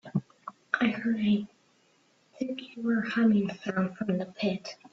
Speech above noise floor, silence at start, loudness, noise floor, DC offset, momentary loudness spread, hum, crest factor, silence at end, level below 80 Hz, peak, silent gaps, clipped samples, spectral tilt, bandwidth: 38 dB; 0.05 s; -30 LUFS; -66 dBFS; under 0.1%; 13 LU; none; 22 dB; 0.2 s; -70 dBFS; -8 dBFS; none; under 0.1%; -7 dB/octave; 7.4 kHz